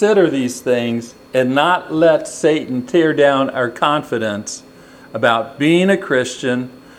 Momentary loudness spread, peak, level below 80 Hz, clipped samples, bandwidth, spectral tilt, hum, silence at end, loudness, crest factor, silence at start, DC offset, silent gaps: 9 LU; 0 dBFS; -60 dBFS; under 0.1%; 15 kHz; -5 dB/octave; none; 0.2 s; -16 LUFS; 16 dB; 0 s; under 0.1%; none